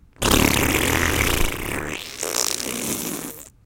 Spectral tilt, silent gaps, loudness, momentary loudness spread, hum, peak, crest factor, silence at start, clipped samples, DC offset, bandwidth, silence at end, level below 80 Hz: -3 dB/octave; none; -21 LUFS; 11 LU; none; 0 dBFS; 22 dB; 0.2 s; under 0.1%; under 0.1%; 17 kHz; 0.2 s; -32 dBFS